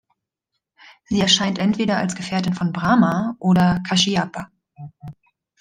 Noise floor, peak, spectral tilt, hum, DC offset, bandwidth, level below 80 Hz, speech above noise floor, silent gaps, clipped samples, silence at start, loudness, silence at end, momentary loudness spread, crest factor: -79 dBFS; -2 dBFS; -4.5 dB/octave; none; under 0.1%; 9.8 kHz; -52 dBFS; 60 dB; none; under 0.1%; 1.1 s; -19 LUFS; 0.5 s; 14 LU; 18 dB